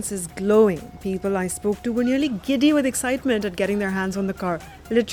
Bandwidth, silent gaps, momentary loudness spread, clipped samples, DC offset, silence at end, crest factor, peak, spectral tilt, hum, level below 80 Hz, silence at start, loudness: 18.5 kHz; none; 10 LU; under 0.1%; under 0.1%; 0 s; 16 dB; -6 dBFS; -5 dB/octave; none; -48 dBFS; 0 s; -22 LUFS